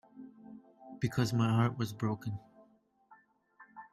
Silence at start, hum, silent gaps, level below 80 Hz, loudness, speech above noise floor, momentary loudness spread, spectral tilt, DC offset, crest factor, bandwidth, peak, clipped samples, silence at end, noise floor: 0.15 s; none; none; -68 dBFS; -33 LUFS; 35 dB; 24 LU; -7 dB/octave; under 0.1%; 18 dB; 14 kHz; -18 dBFS; under 0.1%; 0.05 s; -67 dBFS